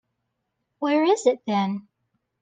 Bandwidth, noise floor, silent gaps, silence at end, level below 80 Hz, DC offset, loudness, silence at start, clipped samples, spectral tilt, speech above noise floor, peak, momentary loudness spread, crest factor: 9.6 kHz; -78 dBFS; none; 0.6 s; -78 dBFS; under 0.1%; -23 LUFS; 0.8 s; under 0.1%; -5.5 dB/octave; 56 dB; -8 dBFS; 10 LU; 18 dB